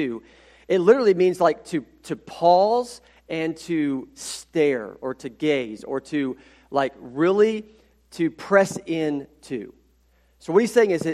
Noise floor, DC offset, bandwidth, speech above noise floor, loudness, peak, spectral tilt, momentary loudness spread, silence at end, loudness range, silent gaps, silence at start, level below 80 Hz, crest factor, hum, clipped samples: -61 dBFS; under 0.1%; 14 kHz; 39 dB; -22 LUFS; -2 dBFS; -5.5 dB/octave; 16 LU; 0 s; 5 LU; none; 0 s; -62 dBFS; 20 dB; none; under 0.1%